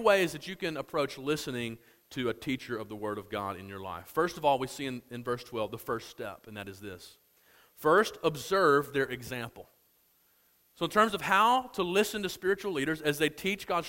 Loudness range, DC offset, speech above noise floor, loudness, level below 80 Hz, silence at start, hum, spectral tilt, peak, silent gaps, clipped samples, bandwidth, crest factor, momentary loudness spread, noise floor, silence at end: 7 LU; under 0.1%; 37 dB; -31 LUFS; -64 dBFS; 0 s; none; -4.5 dB/octave; -10 dBFS; none; under 0.1%; 16.5 kHz; 22 dB; 16 LU; -68 dBFS; 0 s